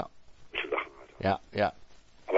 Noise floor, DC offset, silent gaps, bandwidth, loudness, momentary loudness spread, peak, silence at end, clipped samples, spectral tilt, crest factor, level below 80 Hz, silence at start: -49 dBFS; under 0.1%; none; 8 kHz; -33 LUFS; 13 LU; -10 dBFS; 0 s; under 0.1%; -6.5 dB/octave; 24 dB; -60 dBFS; 0 s